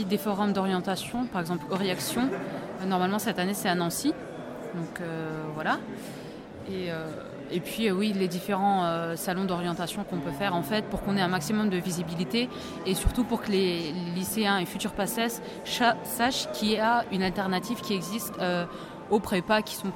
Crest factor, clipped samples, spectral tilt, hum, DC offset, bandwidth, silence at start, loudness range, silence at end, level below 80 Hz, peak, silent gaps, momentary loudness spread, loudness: 18 dB; under 0.1%; -4.5 dB/octave; none; under 0.1%; 18 kHz; 0 s; 4 LU; 0 s; -48 dBFS; -10 dBFS; none; 9 LU; -29 LUFS